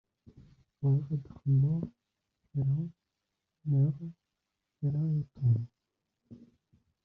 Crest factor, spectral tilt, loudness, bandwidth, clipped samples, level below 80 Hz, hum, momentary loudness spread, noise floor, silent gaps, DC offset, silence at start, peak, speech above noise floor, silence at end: 16 dB; -14 dB/octave; -32 LUFS; 1.4 kHz; under 0.1%; -66 dBFS; none; 14 LU; -86 dBFS; none; under 0.1%; 0.8 s; -18 dBFS; 56 dB; 0.65 s